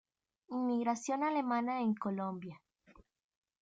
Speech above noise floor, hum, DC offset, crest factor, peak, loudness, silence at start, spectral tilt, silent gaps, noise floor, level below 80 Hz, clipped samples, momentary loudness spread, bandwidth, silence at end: 30 dB; none; under 0.1%; 16 dB; -22 dBFS; -36 LUFS; 0.5 s; -6 dB/octave; none; -65 dBFS; -78 dBFS; under 0.1%; 9 LU; 9.2 kHz; 0.6 s